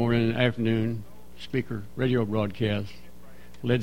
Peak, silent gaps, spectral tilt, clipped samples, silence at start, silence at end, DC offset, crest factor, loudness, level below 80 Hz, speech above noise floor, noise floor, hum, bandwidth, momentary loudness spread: -8 dBFS; none; -8 dB/octave; under 0.1%; 0 s; 0 s; 1%; 20 dB; -27 LUFS; -52 dBFS; 24 dB; -50 dBFS; 60 Hz at -50 dBFS; 16 kHz; 11 LU